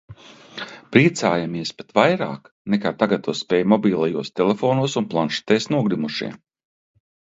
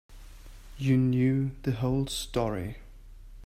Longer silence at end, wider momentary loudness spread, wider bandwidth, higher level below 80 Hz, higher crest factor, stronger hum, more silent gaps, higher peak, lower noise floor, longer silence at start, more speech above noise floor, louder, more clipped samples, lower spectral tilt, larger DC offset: first, 1 s vs 0 s; about the same, 12 LU vs 11 LU; second, 8 kHz vs 15.5 kHz; second, -60 dBFS vs -46 dBFS; about the same, 20 dB vs 16 dB; neither; first, 2.52-2.65 s vs none; first, 0 dBFS vs -14 dBFS; second, -40 dBFS vs -47 dBFS; about the same, 0.1 s vs 0.1 s; about the same, 20 dB vs 20 dB; first, -20 LUFS vs -28 LUFS; neither; about the same, -5.5 dB/octave vs -6.5 dB/octave; neither